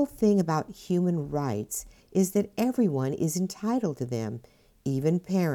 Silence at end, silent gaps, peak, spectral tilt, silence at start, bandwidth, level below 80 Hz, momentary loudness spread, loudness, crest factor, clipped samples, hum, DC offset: 0 s; none; -12 dBFS; -6.5 dB/octave; 0 s; 18.5 kHz; -58 dBFS; 9 LU; -28 LUFS; 14 dB; under 0.1%; none; under 0.1%